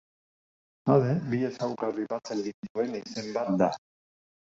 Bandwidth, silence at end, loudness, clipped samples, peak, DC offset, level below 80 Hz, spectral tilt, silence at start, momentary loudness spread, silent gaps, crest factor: 8 kHz; 0.85 s; -29 LUFS; under 0.1%; -8 dBFS; under 0.1%; -68 dBFS; -7 dB/octave; 0.85 s; 10 LU; 2.54-2.63 s, 2.70-2.75 s; 22 dB